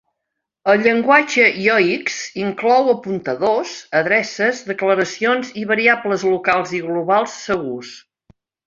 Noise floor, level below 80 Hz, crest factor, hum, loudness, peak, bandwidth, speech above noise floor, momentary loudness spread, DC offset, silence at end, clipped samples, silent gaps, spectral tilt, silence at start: -79 dBFS; -62 dBFS; 18 dB; none; -17 LUFS; 0 dBFS; 7.6 kHz; 62 dB; 10 LU; under 0.1%; 0.65 s; under 0.1%; none; -4 dB/octave; 0.65 s